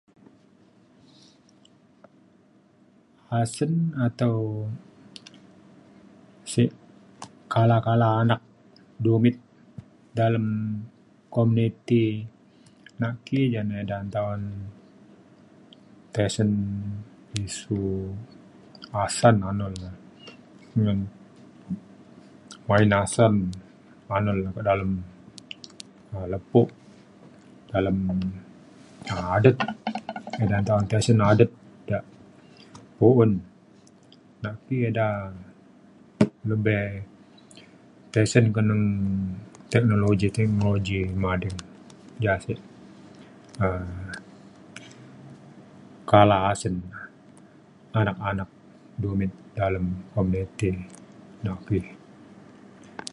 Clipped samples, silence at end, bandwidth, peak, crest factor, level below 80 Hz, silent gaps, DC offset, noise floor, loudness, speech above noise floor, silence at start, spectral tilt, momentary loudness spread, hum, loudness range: under 0.1%; 0.05 s; 11.5 kHz; -2 dBFS; 24 dB; -48 dBFS; none; under 0.1%; -58 dBFS; -25 LUFS; 35 dB; 3.3 s; -7 dB/octave; 23 LU; none; 7 LU